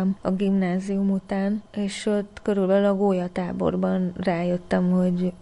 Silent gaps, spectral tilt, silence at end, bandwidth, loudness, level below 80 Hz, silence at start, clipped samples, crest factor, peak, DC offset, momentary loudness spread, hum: none; -7.5 dB/octave; 0.05 s; 10.5 kHz; -24 LUFS; -52 dBFS; 0 s; under 0.1%; 14 dB; -10 dBFS; under 0.1%; 6 LU; none